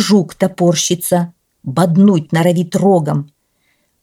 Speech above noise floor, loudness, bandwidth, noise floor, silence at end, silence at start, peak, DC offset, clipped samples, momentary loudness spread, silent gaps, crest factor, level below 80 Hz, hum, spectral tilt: 49 dB; -14 LUFS; 16.5 kHz; -62 dBFS; 0.75 s; 0 s; -2 dBFS; under 0.1%; under 0.1%; 11 LU; none; 12 dB; -58 dBFS; none; -5.5 dB/octave